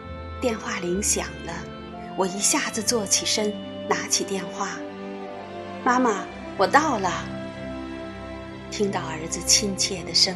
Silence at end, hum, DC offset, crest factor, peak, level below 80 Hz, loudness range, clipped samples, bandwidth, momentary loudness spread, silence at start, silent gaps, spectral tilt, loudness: 0 s; none; under 0.1%; 24 dB; 0 dBFS; -48 dBFS; 2 LU; under 0.1%; 13 kHz; 16 LU; 0 s; none; -2 dB/octave; -24 LUFS